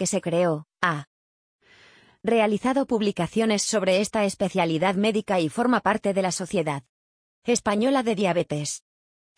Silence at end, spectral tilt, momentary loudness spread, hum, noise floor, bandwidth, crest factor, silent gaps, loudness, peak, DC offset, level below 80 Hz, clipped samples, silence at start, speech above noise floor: 0.6 s; -4.5 dB/octave; 7 LU; none; -55 dBFS; 10.5 kHz; 18 dB; 1.07-1.59 s, 6.89-7.42 s; -24 LUFS; -6 dBFS; under 0.1%; -60 dBFS; under 0.1%; 0 s; 32 dB